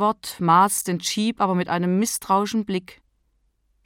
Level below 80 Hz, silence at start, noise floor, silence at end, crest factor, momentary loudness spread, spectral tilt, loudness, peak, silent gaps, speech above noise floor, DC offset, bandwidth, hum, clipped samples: -62 dBFS; 0 s; -67 dBFS; 0.95 s; 18 dB; 8 LU; -4.5 dB/octave; -22 LUFS; -4 dBFS; none; 46 dB; under 0.1%; 17.5 kHz; none; under 0.1%